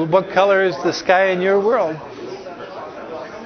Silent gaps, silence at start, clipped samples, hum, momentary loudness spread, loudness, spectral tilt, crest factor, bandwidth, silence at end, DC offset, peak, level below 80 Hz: none; 0 s; under 0.1%; none; 17 LU; -16 LUFS; -5.5 dB/octave; 18 dB; 6.6 kHz; 0 s; under 0.1%; -2 dBFS; -60 dBFS